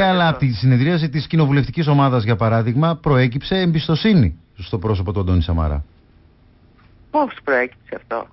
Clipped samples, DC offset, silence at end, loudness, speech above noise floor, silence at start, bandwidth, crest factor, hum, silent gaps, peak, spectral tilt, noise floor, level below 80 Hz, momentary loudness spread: under 0.1%; under 0.1%; 0.1 s; -18 LUFS; 34 dB; 0 s; 5.8 kHz; 12 dB; none; none; -6 dBFS; -11.5 dB/octave; -51 dBFS; -32 dBFS; 9 LU